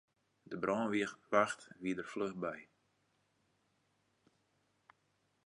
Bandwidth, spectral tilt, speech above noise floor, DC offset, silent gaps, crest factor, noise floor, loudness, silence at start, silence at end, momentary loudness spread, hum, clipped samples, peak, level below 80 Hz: 11 kHz; -5 dB/octave; 41 dB; under 0.1%; none; 28 dB; -79 dBFS; -37 LUFS; 0.5 s; 2.8 s; 10 LU; none; under 0.1%; -14 dBFS; -80 dBFS